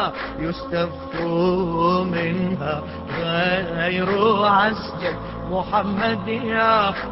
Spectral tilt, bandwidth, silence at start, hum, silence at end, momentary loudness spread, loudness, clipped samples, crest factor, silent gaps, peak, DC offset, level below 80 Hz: -10.5 dB/octave; 5.8 kHz; 0 s; none; 0 s; 10 LU; -21 LUFS; under 0.1%; 16 dB; none; -6 dBFS; under 0.1%; -42 dBFS